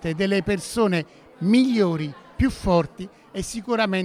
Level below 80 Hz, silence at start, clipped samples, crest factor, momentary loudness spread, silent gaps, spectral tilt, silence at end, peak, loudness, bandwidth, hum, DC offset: -40 dBFS; 0 s; under 0.1%; 16 dB; 14 LU; none; -6 dB/octave; 0 s; -6 dBFS; -23 LUFS; 15 kHz; none; under 0.1%